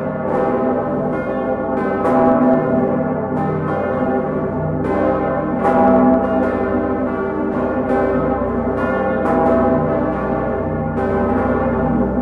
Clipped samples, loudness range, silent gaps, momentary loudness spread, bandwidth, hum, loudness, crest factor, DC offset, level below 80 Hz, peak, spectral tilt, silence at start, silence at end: under 0.1%; 1 LU; none; 6 LU; 4.7 kHz; none; -17 LUFS; 14 dB; under 0.1%; -36 dBFS; -4 dBFS; -10 dB/octave; 0 s; 0 s